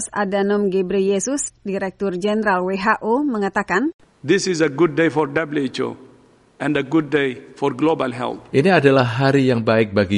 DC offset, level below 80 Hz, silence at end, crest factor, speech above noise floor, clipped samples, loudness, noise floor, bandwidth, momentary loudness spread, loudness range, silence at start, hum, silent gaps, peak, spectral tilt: under 0.1%; -56 dBFS; 0 s; 18 dB; 33 dB; under 0.1%; -19 LUFS; -51 dBFS; 11.5 kHz; 9 LU; 3 LU; 0 s; none; 3.94-3.99 s; -2 dBFS; -5.5 dB/octave